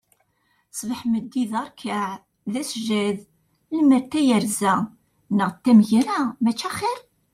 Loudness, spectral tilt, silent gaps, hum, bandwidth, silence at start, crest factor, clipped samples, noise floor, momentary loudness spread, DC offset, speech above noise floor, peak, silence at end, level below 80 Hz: -22 LUFS; -5 dB/octave; none; none; 15 kHz; 0.75 s; 18 dB; under 0.1%; -67 dBFS; 14 LU; under 0.1%; 46 dB; -6 dBFS; 0.35 s; -66 dBFS